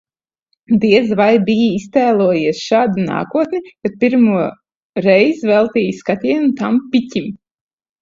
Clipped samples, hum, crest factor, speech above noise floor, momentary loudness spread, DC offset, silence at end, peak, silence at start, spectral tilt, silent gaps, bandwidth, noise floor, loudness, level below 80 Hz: under 0.1%; none; 14 dB; 55 dB; 9 LU; under 0.1%; 0.65 s; 0 dBFS; 0.7 s; -6.5 dB/octave; 4.75-4.93 s; 7.6 kHz; -69 dBFS; -15 LUFS; -56 dBFS